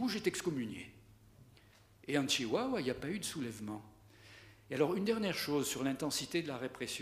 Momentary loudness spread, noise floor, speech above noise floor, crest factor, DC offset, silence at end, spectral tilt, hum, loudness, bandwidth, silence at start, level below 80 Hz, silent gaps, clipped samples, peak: 18 LU; -63 dBFS; 27 dB; 20 dB; under 0.1%; 0 s; -4 dB/octave; none; -37 LUFS; 15.5 kHz; 0 s; -68 dBFS; none; under 0.1%; -18 dBFS